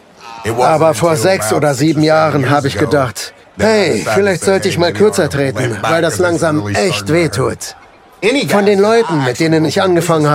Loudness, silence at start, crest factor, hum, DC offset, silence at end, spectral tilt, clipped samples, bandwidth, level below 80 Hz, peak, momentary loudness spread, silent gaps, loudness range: -13 LUFS; 0.2 s; 12 dB; none; under 0.1%; 0 s; -5 dB/octave; under 0.1%; 16 kHz; -52 dBFS; 0 dBFS; 7 LU; none; 2 LU